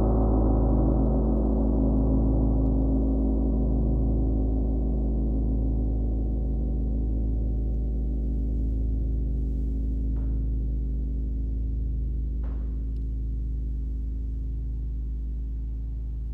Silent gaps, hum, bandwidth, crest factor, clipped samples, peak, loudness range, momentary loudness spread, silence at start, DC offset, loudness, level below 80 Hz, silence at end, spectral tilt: none; none; 1.5 kHz; 14 dB; under 0.1%; -10 dBFS; 8 LU; 9 LU; 0 s; under 0.1%; -28 LUFS; -26 dBFS; 0 s; -13 dB/octave